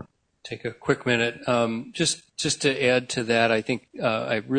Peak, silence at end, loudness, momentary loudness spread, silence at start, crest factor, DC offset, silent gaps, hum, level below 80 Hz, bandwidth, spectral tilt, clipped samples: -6 dBFS; 0 s; -24 LUFS; 9 LU; 0 s; 20 dB; under 0.1%; none; none; -62 dBFS; 9.6 kHz; -3.5 dB/octave; under 0.1%